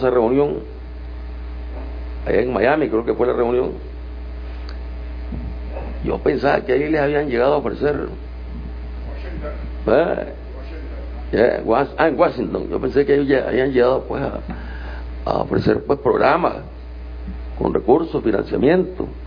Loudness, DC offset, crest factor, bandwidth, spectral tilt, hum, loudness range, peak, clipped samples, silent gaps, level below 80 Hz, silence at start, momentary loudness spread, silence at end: -19 LUFS; under 0.1%; 18 dB; 5.2 kHz; -9 dB/octave; none; 5 LU; 0 dBFS; under 0.1%; none; -32 dBFS; 0 s; 16 LU; 0 s